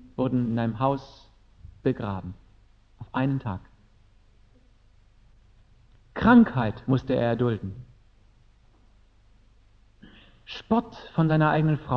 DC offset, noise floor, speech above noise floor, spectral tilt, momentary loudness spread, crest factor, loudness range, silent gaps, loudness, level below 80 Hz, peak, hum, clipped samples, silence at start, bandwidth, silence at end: under 0.1%; -57 dBFS; 34 dB; -9.5 dB/octave; 21 LU; 20 dB; 11 LU; none; -25 LUFS; -52 dBFS; -6 dBFS; none; under 0.1%; 0.2 s; 6.2 kHz; 0 s